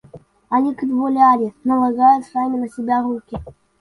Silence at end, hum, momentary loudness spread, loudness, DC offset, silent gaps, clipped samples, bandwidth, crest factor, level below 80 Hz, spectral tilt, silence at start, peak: 0.3 s; none; 11 LU; -18 LUFS; under 0.1%; none; under 0.1%; 11 kHz; 16 dB; -50 dBFS; -7.5 dB/octave; 0.15 s; -2 dBFS